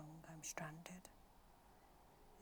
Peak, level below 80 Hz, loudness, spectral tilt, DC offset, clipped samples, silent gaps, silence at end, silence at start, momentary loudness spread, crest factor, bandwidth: -30 dBFS; -72 dBFS; -53 LUFS; -3.5 dB/octave; under 0.1%; under 0.1%; none; 0 s; 0 s; 20 LU; 26 dB; over 20 kHz